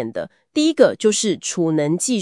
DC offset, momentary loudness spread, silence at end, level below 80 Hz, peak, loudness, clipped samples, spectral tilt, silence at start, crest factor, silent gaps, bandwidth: under 0.1%; 11 LU; 0 s; -70 dBFS; 0 dBFS; -18 LUFS; under 0.1%; -4 dB/octave; 0 s; 18 dB; none; 12 kHz